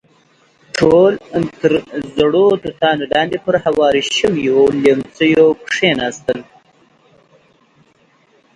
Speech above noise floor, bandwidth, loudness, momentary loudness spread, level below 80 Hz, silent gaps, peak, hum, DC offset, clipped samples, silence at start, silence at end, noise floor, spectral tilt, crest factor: 40 dB; 10.5 kHz; -14 LUFS; 9 LU; -50 dBFS; none; 0 dBFS; none; under 0.1%; under 0.1%; 0.75 s; 2.15 s; -54 dBFS; -5 dB/octave; 16 dB